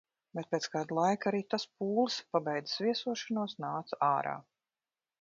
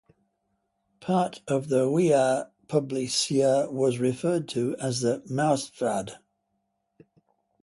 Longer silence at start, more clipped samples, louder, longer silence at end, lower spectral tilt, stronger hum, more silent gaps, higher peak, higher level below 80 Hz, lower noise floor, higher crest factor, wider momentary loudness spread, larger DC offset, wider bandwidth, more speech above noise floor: second, 0.35 s vs 1 s; neither; second, -34 LUFS vs -26 LUFS; second, 0.8 s vs 1.45 s; second, -3.5 dB/octave vs -5 dB/octave; neither; neither; second, -14 dBFS vs -10 dBFS; second, -82 dBFS vs -68 dBFS; first, under -90 dBFS vs -77 dBFS; about the same, 20 dB vs 18 dB; about the same, 8 LU vs 7 LU; neither; second, 7.4 kHz vs 11.5 kHz; first, over 57 dB vs 52 dB